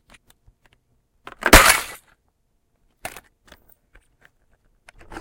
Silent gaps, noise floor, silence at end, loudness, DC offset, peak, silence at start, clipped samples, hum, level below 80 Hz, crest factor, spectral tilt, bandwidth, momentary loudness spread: none; -68 dBFS; 3.35 s; -13 LUFS; under 0.1%; 0 dBFS; 1.45 s; under 0.1%; none; -32 dBFS; 24 dB; -2 dB/octave; 17 kHz; 26 LU